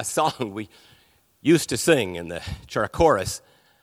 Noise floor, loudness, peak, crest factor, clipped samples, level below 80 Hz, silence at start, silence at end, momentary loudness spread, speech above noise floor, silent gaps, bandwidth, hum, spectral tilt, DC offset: -60 dBFS; -23 LUFS; -4 dBFS; 20 dB; under 0.1%; -46 dBFS; 0 s; 0.45 s; 14 LU; 37 dB; none; 16 kHz; none; -4.5 dB/octave; under 0.1%